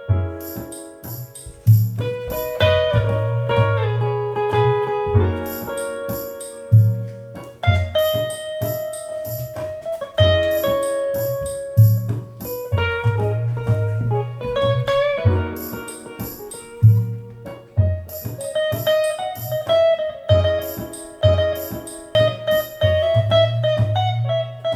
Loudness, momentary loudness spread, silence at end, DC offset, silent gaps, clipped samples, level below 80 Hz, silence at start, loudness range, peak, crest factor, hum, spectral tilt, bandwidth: -20 LUFS; 15 LU; 0 s; under 0.1%; none; under 0.1%; -40 dBFS; 0 s; 3 LU; -4 dBFS; 16 dB; none; -6 dB/octave; 15 kHz